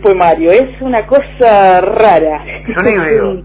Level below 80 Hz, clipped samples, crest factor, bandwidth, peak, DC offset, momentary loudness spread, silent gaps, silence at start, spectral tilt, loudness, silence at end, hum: -32 dBFS; 0.6%; 8 dB; 4 kHz; 0 dBFS; under 0.1%; 9 LU; none; 0 s; -9.5 dB/octave; -9 LUFS; 0 s; none